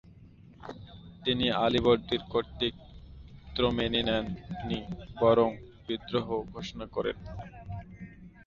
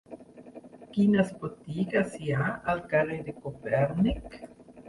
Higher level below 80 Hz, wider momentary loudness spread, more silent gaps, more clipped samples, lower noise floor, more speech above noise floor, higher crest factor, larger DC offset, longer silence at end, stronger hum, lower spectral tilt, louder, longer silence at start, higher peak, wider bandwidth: about the same, -50 dBFS vs -50 dBFS; about the same, 22 LU vs 23 LU; neither; neither; first, -53 dBFS vs -48 dBFS; first, 24 dB vs 20 dB; about the same, 20 dB vs 18 dB; neither; about the same, 0.05 s vs 0 s; neither; second, -6.5 dB/octave vs -8 dB/octave; about the same, -30 LUFS vs -29 LUFS; about the same, 0.05 s vs 0.1 s; about the same, -12 dBFS vs -12 dBFS; second, 7.2 kHz vs 11.5 kHz